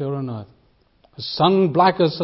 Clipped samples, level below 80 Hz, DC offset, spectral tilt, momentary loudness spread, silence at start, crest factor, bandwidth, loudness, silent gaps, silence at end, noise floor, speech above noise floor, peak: under 0.1%; -60 dBFS; under 0.1%; -10.5 dB/octave; 16 LU; 0 s; 18 dB; 5.8 kHz; -18 LUFS; none; 0 s; -58 dBFS; 39 dB; -2 dBFS